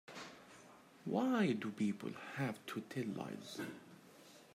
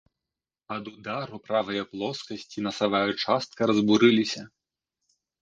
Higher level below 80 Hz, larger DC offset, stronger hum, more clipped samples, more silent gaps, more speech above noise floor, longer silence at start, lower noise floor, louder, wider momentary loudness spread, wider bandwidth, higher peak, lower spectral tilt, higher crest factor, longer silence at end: second, -86 dBFS vs -66 dBFS; neither; neither; neither; neither; second, 22 dB vs 64 dB; second, 0.1 s vs 0.7 s; second, -61 dBFS vs -90 dBFS; second, -41 LUFS vs -26 LUFS; first, 24 LU vs 17 LU; first, 15.5 kHz vs 7.8 kHz; second, -24 dBFS vs -6 dBFS; about the same, -6 dB/octave vs -5 dB/octave; about the same, 18 dB vs 22 dB; second, 0 s vs 0.95 s